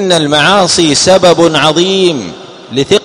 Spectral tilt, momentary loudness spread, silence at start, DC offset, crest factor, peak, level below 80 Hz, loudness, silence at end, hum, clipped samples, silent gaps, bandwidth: -3.5 dB/octave; 11 LU; 0 s; under 0.1%; 8 dB; 0 dBFS; -44 dBFS; -8 LUFS; 0 s; none; 1%; none; 13 kHz